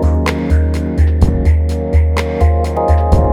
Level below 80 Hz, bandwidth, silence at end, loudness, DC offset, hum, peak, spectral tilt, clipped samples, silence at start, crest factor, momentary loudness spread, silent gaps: -14 dBFS; 9.6 kHz; 0 s; -14 LUFS; under 0.1%; none; 0 dBFS; -8 dB/octave; under 0.1%; 0 s; 12 dB; 3 LU; none